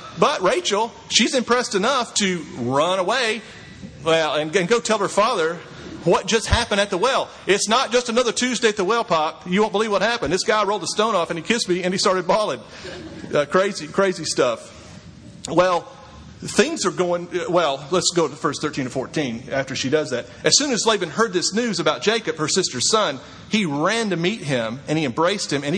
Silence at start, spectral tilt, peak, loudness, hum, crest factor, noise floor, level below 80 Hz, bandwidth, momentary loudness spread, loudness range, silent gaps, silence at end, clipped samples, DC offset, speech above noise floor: 0 s; -3 dB/octave; 0 dBFS; -20 LUFS; none; 20 dB; -41 dBFS; -46 dBFS; 10.5 kHz; 7 LU; 3 LU; none; 0 s; under 0.1%; under 0.1%; 20 dB